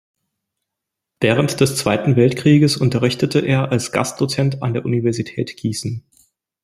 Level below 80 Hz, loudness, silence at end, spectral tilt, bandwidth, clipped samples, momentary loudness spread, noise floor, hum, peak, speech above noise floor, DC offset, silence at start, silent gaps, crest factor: -52 dBFS; -18 LUFS; 0.65 s; -6 dB/octave; 15.5 kHz; under 0.1%; 10 LU; -82 dBFS; none; -2 dBFS; 65 dB; under 0.1%; 1.2 s; none; 16 dB